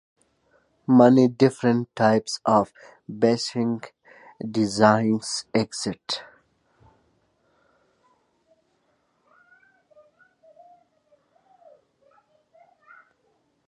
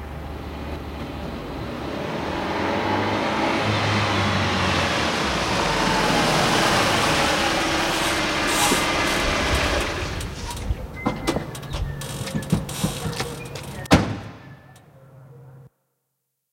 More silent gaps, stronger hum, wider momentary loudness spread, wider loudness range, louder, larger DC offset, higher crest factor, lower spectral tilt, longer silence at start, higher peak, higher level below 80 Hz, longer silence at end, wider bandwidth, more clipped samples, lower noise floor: neither; neither; first, 16 LU vs 13 LU; first, 12 LU vs 8 LU; about the same, -22 LUFS vs -22 LUFS; neither; about the same, 22 dB vs 24 dB; first, -5.5 dB/octave vs -4 dB/octave; first, 0.9 s vs 0 s; about the same, -2 dBFS vs 0 dBFS; second, -66 dBFS vs -36 dBFS; first, 7.45 s vs 0.85 s; second, 11 kHz vs 16.5 kHz; neither; second, -69 dBFS vs -77 dBFS